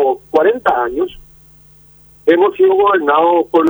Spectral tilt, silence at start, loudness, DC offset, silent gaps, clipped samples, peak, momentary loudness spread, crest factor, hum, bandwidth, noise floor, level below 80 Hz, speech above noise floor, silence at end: -6 dB/octave; 0 s; -13 LUFS; under 0.1%; none; under 0.1%; 0 dBFS; 8 LU; 14 dB; none; over 20 kHz; -45 dBFS; -48 dBFS; 32 dB; 0 s